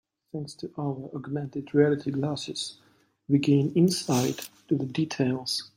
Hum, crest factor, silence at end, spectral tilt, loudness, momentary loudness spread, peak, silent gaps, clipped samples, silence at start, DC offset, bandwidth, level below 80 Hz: none; 18 dB; 0.1 s; -5.5 dB/octave; -27 LUFS; 13 LU; -8 dBFS; none; under 0.1%; 0.35 s; under 0.1%; 16.5 kHz; -68 dBFS